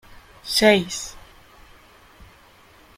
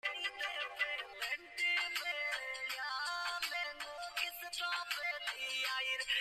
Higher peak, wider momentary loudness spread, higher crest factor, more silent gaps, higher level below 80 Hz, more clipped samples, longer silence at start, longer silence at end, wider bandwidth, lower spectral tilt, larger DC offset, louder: first, -2 dBFS vs -24 dBFS; first, 20 LU vs 6 LU; first, 24 dB vs 16 dB; neither; first, -52 dBFS vs -76 dBFS; neither; about the same, 0.15 s vs 0.05 s; first, 1.8 s vs 0 s; about the same, 16.5 kHz vs 15 kHz; first, -3 dB/octave vs 2 dB/octave; neither; first, -19 LUFS vs -38 LUFS